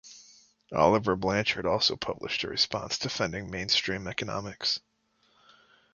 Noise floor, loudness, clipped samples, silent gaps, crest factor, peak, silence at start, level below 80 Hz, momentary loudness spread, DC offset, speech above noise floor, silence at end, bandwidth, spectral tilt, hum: -69 dBFS; -28 LUFS; under 0.1%; none; 24 dB; -6 dBFS; 0.05 s; -56 dBFS; 10 LU; under 0.1%; 41 dB; 1.15 s; 7.4 kHz; -3.5 dB/octave; none